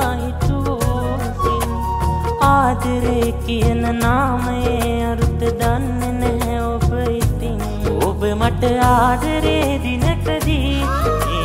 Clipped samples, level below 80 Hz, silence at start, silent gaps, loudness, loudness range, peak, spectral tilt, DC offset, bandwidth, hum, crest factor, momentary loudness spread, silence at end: under 0.1%; -24 dBFS; 0 s; none; -18 LUFS; 2 LU; -2 dBFS; -6 dB/octave; under 0.1%; 16 kHz; none; 16 dB; 6 LU; 0 s